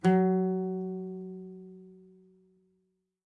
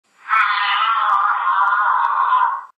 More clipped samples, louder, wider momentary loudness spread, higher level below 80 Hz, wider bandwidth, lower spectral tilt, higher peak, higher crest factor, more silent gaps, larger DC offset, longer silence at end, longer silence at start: neither; second, -30 LUFS vs -16 LUFS; first, 24 LU vs 1 LU; first, -76 dBFS vs -82 dBFS; about the same, 7.6 kHz vs 8 kHz; first, -9 dB/octave vs 1.5 dB/octave; second, -14 dBFS vs -6 dBFS; first, 18 dB vs 12 dB; neither; neither; first, 1.3 s vs 0.1 s; second, 0.05 s vs 0.25 s